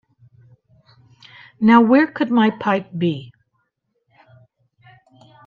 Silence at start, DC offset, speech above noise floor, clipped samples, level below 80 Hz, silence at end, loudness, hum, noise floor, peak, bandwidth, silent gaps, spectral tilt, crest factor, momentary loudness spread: 1.6 s; under 0.1%; 55 dB; under 0.1%; -68 dBFS; 2.2 s; -17 LUFS; none; -71 dBFS; -2 dBFS; 5 kHz; none; -8 dB/octave; 20 dB; 11 LU